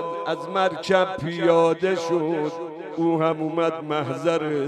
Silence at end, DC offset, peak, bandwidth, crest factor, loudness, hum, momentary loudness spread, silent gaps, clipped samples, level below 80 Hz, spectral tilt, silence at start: 0 s; under 0.1%; -6 dBFS; 10.5 kHz; 16 dB; -23 LUFS; none; 8 LU; none; under 0.1%; -66 dBFS; -6 dB/octave; 0 s